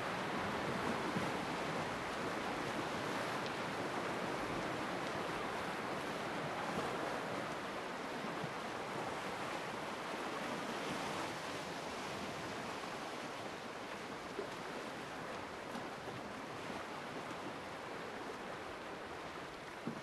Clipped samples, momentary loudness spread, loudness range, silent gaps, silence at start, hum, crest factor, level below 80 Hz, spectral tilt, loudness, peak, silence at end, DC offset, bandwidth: under 0.1%; 6 LU; 6 LU; none; 0 s; none; 18 dB; -68 dBFS; -4 dB/octave; -42 LUFS; -24 dBFS; 0 s; under 0.1%; 13 kHz